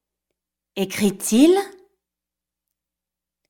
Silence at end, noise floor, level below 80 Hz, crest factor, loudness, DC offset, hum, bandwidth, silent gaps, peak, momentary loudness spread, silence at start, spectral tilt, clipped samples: 1.8 s; -87 dBFS; -64 dBFS; 20 dB; -19 LUFS; under 0.1%; none; 17.5 kHz; none; -4 dBFS; 19 LU; 0.75 s; -4.5 dB/octave; under 0.1%